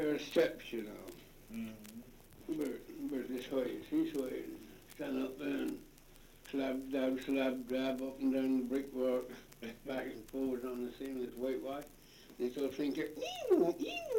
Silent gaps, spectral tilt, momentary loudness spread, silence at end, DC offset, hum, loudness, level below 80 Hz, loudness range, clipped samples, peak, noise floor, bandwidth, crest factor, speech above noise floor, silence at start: none; -5 dB/octave; 17 LU; 0 s; under 0.1%; none; -38 LUFS; -64 dBFS; 5 LU; under 0.1%; -18 dBFS; -59 dBFS; 17 kHz; 20 dB; 22 dB; 0 s